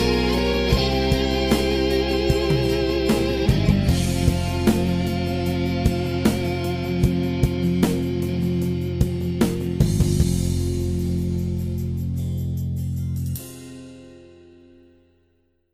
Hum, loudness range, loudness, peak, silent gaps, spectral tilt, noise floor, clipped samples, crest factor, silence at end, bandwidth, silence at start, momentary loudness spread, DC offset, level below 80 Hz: none; 8 LU; -22 LUFS; -6 dBFS; none; -6.5 dB/octave; -65 dBFS; under 0.1%; 14 dB; 1.5 s; 16.5 kHz; 0 s; 7 LU; under 0.1%; -30 dBFS